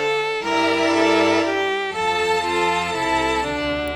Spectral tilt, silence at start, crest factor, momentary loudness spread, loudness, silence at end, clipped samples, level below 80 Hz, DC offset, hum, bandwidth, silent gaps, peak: -3.5 dB/octave; 0 s; 16 dB; 5 LU; -19 LUFS; 0 s; under 0.1%; -46 dBFS; under 0.1%; none; 14 kHz; none; -4 dBFS